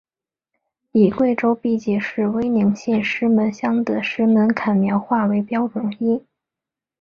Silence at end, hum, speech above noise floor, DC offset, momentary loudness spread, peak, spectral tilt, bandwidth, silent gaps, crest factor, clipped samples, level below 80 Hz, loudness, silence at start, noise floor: 0.8 s; none; 69 dB; under 0.1%; 6 LU; -4 dBFS; -7.5 dB/octave; 7 kHz; none; 16 dB; under 0.1%; -58 dBFS; -19 LUFS; 0.95 s; -87 dBFS